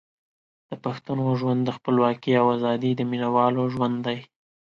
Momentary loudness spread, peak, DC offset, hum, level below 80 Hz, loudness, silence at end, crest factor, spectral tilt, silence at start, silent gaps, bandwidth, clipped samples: 11 LU; -6 dBFS; under 0.1%; none; -66 dBFS; -24 LUFS; 0.5 s; 18 dB; -8.5 dB/octave; 0.7 s; none; 7 kHz; under 0.1%